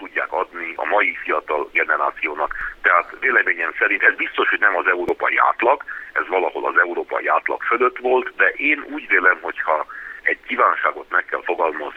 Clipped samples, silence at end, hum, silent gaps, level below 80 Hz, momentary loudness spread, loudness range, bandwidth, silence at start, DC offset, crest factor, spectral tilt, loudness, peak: under 0.1%; 0 s; none; none; -54 dBFS; 7 LU; 2 LU; 7 kHz; 0 s; under 0.1%; 20 dB; -4.5 dB/octave; -19 LUFS; 0 dBFS